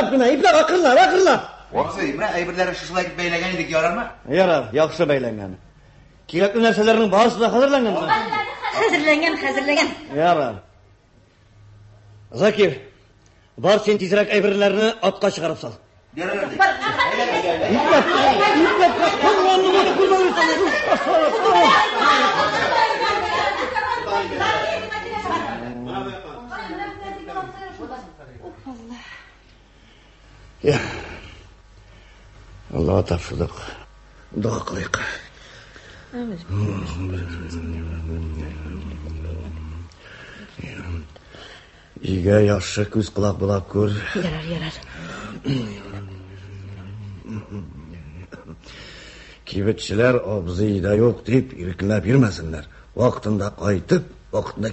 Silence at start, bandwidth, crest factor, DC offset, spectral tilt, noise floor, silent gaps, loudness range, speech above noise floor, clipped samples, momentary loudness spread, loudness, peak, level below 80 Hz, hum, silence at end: 0 s; 8.4 kHz; 20 dB; under 0.1%; -5.5 dB/octave; -54 dBFS; none; 16 LU; 35 dB; under 0.1%; 21 LU; -19 LUFS; -2 dBFS; -40 dBFS; none; 0 s